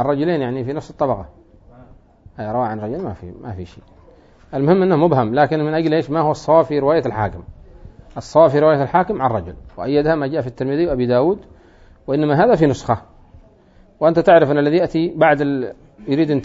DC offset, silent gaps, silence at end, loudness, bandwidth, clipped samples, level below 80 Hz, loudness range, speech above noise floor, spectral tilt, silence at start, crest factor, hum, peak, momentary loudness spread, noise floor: under 0.1%; none; 0 s; -17 LUFS; 7.8 kHz; under 0.1%; -44 dBFS; 8 LU; 33 dB; -8 dB/octave; 0 s; 16 dB; none; 0 dBFS; 17 LU; -49 dBFS